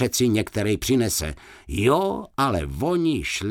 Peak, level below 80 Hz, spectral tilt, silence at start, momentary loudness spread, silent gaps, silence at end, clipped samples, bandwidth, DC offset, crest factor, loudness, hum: -6 dBFS; -40 dBFS; -4.5 dB/octave; 0 s; 6 LU; none; 0 s; under 0.1%; 18 kHz; under 0.1%; 16 dB; -23 LUFS; none